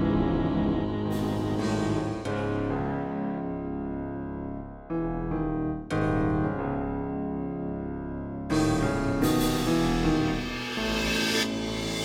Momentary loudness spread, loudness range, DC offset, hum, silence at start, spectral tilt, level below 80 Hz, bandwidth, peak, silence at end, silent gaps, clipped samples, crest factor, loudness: 9 LU; 6 LU; under 0.1%; none; 0 s; -5.5 dB/octave; -40 dBFS; 17 kHz; -12 dBFS; 0 s; none; under 0.1%; 16 dB; -28 LUFS